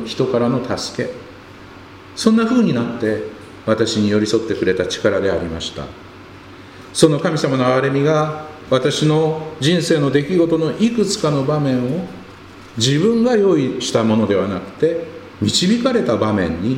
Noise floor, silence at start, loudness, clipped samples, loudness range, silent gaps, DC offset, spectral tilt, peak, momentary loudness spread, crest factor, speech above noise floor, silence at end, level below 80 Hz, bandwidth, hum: -38 dBFS; 0 s; -17 LUFS; under 0.1%; 3 LU; none; under 0.1%; -5.5 dB/octave; 0 dBFS; 12 LU; 18 dB; 22 dB; 0 s; -48 dBFS; 15.5 kHz; none